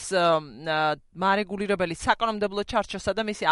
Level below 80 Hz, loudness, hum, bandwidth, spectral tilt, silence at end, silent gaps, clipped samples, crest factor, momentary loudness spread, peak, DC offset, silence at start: -50 dBFS; -26 LUFS; none; 11.5 kHz; -4 dB/octave; 0 s; none; under 0.1%; 18 dB; 5 LU; -6 dBFS; under 0.1%; 0 s